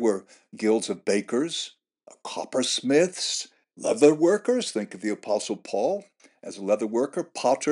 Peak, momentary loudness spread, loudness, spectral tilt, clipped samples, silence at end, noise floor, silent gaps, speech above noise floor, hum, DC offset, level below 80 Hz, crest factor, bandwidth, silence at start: -4 dBFS; 14 LU; -25 LUFS; -3.5 dB/octave; under 0.1%; 0 s; -49 dBFS; none; 24 dB; none; under 0.1%; under -90 dBFS; 20 dB; 11.5 kHz; 0 s